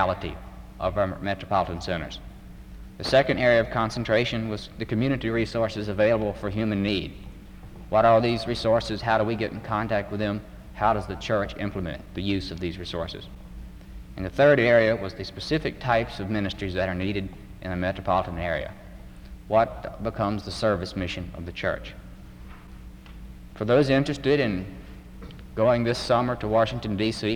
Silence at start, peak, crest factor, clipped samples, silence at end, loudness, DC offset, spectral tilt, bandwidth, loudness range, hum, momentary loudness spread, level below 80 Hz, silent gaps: 0 s; -8 dBFS; 18 dB; under 0.1%; 0 s; -25 LUFS; under 0.1%; -6.5 dB/octave; 16.5 kHz; 5 LU; none; 24 LU; -44 dBFS; none